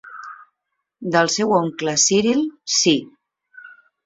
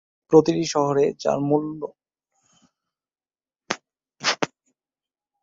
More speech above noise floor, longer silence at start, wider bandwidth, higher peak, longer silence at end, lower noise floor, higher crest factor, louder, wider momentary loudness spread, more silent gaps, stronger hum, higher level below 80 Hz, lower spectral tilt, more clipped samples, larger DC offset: second, 59 dB vs over 70 dB; second, 0.05 s vs 0.3 s; about the same, 8.2 kHz vs 7.8 kHz; about the same, -2 dBFS vs 0 dBFS; second, 0.3 s vs 0.95 s; second, -78 dBFS vs under -90 dBFS; second, 18 dB vs 24 dB; first, -18 LUFS vs -22 LUFS; first, 19 LU vs 14 LU; neither; neither; about the same, -62 dBFS vs -64 dBFS; second, -3 dB/octave vs -5 dB/octave; neither; neither